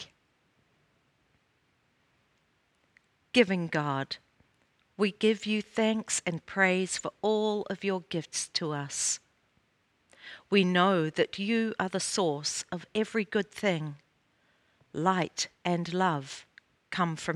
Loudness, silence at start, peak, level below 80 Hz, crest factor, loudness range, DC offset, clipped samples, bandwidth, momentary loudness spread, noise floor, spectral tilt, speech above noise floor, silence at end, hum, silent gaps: -29 LUFS; 0 s; -8 dBFS; -72 dBFS; 24 dB; 4 LU; under 0.1%; under 0.1%; 12.5 kHz; 10 LU; -72 dBFS; -4 dB/octave; 42 dB; 0 s; none; none